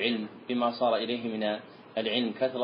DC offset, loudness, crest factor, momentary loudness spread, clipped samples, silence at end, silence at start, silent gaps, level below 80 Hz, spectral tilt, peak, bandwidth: under 0.1%; -30 LUFS; 18 dB; 7 LU; under 0.1%; 0 s; 0 s; none; -78 dBFS; -8.5 dB/octave; -12 dBFS; 5.2 kHz